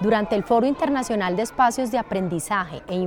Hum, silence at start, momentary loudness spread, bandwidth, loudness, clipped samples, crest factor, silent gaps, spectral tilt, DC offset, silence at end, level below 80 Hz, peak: none; 0 s; 6 LU; 18.5 kHz; -22 LUFS; under 0.1%; 14 dB; none; -5.5 dB/octave; under 0.1%; 0 s; -50 dBFS; -8 dBFS